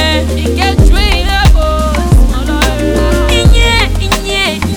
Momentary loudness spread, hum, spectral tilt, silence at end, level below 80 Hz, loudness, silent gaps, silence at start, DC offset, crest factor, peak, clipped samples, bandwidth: 4 LU; none; -5 dB/octave; 0 s; -10 dBFS; -10 LUFS; none; 0 s; under 0.1%; 8 dB; 0 dBFS; 0.8%; over 20 kHz